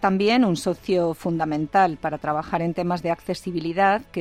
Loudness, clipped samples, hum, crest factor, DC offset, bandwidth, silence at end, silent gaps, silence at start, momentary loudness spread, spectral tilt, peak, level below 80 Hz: -23 LUFS; under 0.1%; none; 16 dB; under 0.1%; 15 kHz; 0 s; none; 0 s; 8 LU; -6 dB/octave; -6 dBFS; -54 dBFS